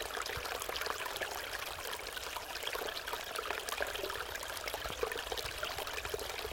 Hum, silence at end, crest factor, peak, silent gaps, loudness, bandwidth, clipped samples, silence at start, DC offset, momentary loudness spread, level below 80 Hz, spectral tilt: none; 0 s; 24 dB; -16 dBFS; none; -39 LUFS; 17 kHz; under 0.1%; 0 s; under 0.1%; 3 LU; -56 dBFS; -1.5 dB/octave